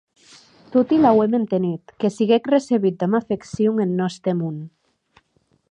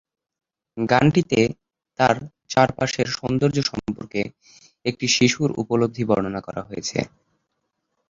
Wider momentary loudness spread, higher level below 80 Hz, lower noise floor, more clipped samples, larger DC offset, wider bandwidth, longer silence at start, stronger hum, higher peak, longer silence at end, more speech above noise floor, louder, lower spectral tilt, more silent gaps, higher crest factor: about the same, 11 LU vs 13 LU; second, -60 dBFS vs -52 dBFS; second, -64 dBFS vs -76 dBFS; neither; neither; first, 10 kHz vs 7.8 kHz; about the same, 0.7 s vs 0.75 s; neither; about the same, -4 dBFS vs -2 dBFS; about the same, 1.05 s vs 1 s; second, 45 dB vs 55 dB; about the same, -20 LUFS vs -22 LUFS; first, -7.5 dB/octave vs -5 dB/octave; neither; about the same, 16 dB vs 20 dB